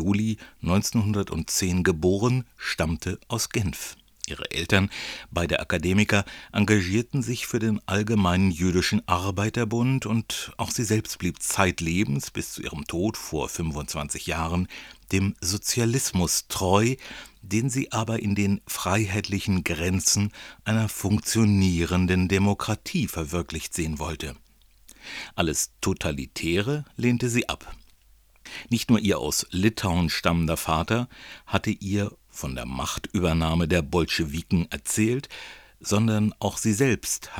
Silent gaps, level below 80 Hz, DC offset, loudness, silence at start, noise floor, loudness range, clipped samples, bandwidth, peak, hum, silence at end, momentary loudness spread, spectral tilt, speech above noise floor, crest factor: none; -44 dBFS; under 0.1%; -25 LUFS; 0 s; -57 dBFS; 4 LU; under 0.1%; over 20 kHz; -4 dBFS; none; 0 s; 10 LU; -4.5 dB/octave; 32 dB; 22 dB